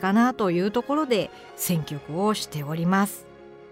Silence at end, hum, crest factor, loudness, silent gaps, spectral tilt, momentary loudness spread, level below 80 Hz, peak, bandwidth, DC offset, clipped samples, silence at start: 0 s; none; 14 dB; -25 LUFS; none; -5.5 dB/octave; 8 LU; -60 dBFS; -10 dBFS; 16 kHz; under 0.1%; under 0.1%; 0 s